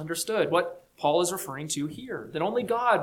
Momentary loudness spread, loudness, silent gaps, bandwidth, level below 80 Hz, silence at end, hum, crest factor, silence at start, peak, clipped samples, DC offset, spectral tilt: 10 LU; -28 LUFS; none; 19 kHz; -66 dBFS; 0 s; none; 18 dB; 0 s; -10 dBFS; under 0.1%; under 0.1%; -3.5 dB/octave